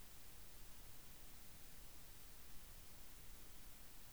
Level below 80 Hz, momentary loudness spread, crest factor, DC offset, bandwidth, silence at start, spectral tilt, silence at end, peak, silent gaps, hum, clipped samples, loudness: -64 dBFS; 0 LU; 14 dB; 0.1%; over 20 kHz; 0 s; -2.5 dB/octave; 0 s; -42 dBFS; none; none; under 0.1%; -58 LUFS